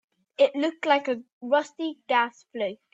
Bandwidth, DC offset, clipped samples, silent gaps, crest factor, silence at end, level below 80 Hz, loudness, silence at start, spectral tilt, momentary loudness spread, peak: 7.8 kHz; under 0.1%; under 0.1%; 1.33-1.41 s; 18 dB; 0.2 s; -80 dBFS; -26 LUFS; 0.4 s; -3.5 dB/octave; 10 LU; -8 dBFS